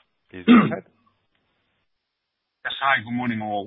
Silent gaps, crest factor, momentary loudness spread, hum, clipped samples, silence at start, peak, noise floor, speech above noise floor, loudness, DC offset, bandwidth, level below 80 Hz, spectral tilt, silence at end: none; 22 dB; 16 LU; none; under 0.1%; 0.35 s; -2 dBFS; -79 dBFS; 59 dB; -20 LUFS; under 0.1%; 4 kHz; -64 dBFS; -10.5 dB/octave; 0 s